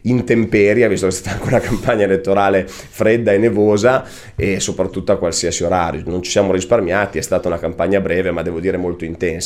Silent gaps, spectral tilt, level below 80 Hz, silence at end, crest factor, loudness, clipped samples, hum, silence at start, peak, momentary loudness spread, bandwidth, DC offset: none; -5 dB/octave; -38 dBFS; 0 s; 14 dB; -16 LUFS; under 0.1%; none; 0.05 s; -2 dBFS; 8 LU; 15.5 kHz; under 0.1%